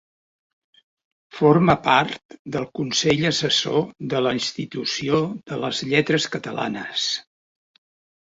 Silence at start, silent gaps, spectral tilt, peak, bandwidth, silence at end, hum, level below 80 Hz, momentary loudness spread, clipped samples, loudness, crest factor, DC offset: 1.35 s; 2.25-2.29 s, 2.39-2.45 s; -4.5 dB/octave; -2 dBFS; 8 kHz; 1.05 s; none; -56 dBFS; 11 LU; under 0.1%; -21 LUFS; 20 dB; under 0.1%